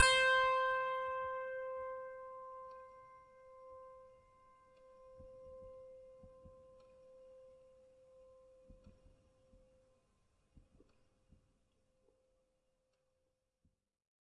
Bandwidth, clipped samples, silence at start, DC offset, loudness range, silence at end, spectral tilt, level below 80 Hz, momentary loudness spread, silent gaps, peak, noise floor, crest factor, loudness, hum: 10.5 kHz; under 0.1%; 0 s; under 0.1%; 25 LU; 5.65 s; 0 dB/octave; -72 dBFS; 29 LU; none; -14 dBFS; -85 dBFS; 30 dB; -36 LUFS; none